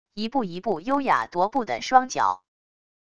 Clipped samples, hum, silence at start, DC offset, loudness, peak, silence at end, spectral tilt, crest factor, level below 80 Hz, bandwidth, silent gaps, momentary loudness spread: under 0.1%; none; 0.05 s; 0.4%; -24 LUFS; -2 dBFS; 0.65 s; -4 dB/octave; 22 dB; -62 dBFS; 10 kHz; none; 7 LU